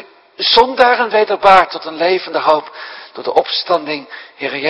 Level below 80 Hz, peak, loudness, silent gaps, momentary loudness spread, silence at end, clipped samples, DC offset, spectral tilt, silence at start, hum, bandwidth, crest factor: -52 dBFS; 0 dBFS; -13 LUFS; none; 16 LU; 0 s; 0.4%; under 0.1%; -4 dB/octave; 0.4 s; none; 11 kHz; 14 dB